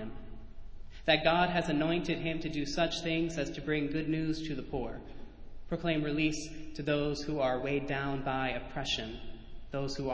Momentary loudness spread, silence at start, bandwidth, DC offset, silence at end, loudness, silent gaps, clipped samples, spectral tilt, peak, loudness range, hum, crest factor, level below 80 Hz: 16 LU; 0 s; 8 kHz; under 0.1%; 0 s; -33 LUFS; none; under 0.1%; -5.5 dB/octave; -10 dBFS; 4 LU; none; 22 dB; -48 dBFS